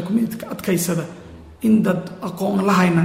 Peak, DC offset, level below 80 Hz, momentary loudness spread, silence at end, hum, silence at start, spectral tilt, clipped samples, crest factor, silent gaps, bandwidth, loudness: -4 dBFS; under 0.1%; -52 dBFS; 12 LU; 0 s; none; 0 s; -6 dB/octave; under 0.1%; 16 dB; none; 16 kHz; -20 LUFS